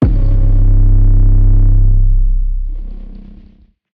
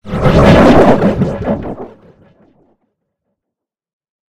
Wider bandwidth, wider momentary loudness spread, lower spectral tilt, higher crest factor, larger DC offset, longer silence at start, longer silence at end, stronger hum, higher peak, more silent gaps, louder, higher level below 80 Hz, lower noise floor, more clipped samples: second, 1.4 kHz vs 13.5 kHz; about the same, 17 LU vs 16 LU; first, -12 dB/octave vs -7.5 dB/octave; about the same, 10 dB vs 12 dB; neither; about the same, 0 s vs 0.05 s; second, 0.7 s vs 2.2 s; neither; about the same, 0 dBFS vs 0 dBFS; neither; second, -14 LUFS vs -9 LUFS; first, -10 dBFS vs -26 dBFS; second, -44 dBFS vs -81 dBFS; second, under 0.1% vs 0.7%